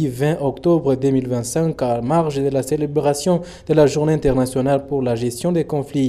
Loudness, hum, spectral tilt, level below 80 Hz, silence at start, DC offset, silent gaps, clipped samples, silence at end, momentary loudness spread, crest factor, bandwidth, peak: -19 LUFS; none; -6.5 dB/octave; -42 dBFS; 0 s; under 0.1%; none; under 0.1%; 0 s; 5 LU; 16 dB; 14 kHz; -2 dBFS